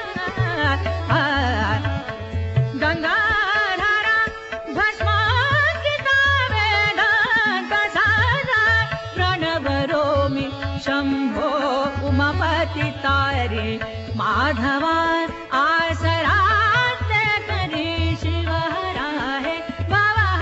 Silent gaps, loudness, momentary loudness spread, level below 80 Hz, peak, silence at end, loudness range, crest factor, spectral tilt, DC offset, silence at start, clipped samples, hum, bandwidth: none; -20 LUFS; 8 LU; -42 dBFS; -6 dBFS; 0 s; 4 LU; 14 dB; -3 dB/octave; under 0.1%; 0 s; under 0.1%; none; 8 kHz